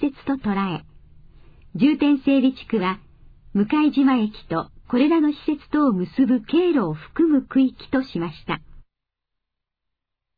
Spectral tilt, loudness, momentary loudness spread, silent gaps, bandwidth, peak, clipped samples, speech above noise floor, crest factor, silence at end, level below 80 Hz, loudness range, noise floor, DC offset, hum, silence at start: -9.5 dB/octave; -21 LUFS; 10 LU; none; 5 kHz; -6 dBFS; under 0.1%; 63 dB; 16 dB; 1.55 s; -50 dBFS; 3 LU; -83 dBFS; under 0.1%; none; 0 s